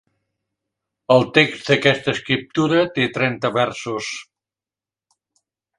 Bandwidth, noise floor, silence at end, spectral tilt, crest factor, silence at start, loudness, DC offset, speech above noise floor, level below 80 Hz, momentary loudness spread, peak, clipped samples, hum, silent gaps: 11 kHz; under -90 dBFS; 1.55 s; -5 dB/octave; 20 dB; 1.1 s; -19 LUFS; under 0.1%; over 71 dB; -60 dBFS; 11 LU; 0 dBFS; under 0.1%; none; none